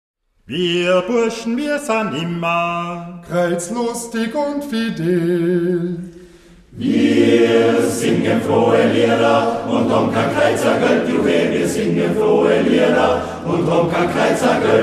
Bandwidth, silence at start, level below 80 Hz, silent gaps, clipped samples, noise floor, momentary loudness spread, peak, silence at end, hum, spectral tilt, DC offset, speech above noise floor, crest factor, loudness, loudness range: 14 kHz; 0.5 s; -50 dBFS; none; under 0.1%; -44 dBFS; 8 LU; -2 dBFS; 0 s; none; -5.5 dB/octave; under 0.1%; 28 dB; 16 dB; -16 LUFS; 5 LU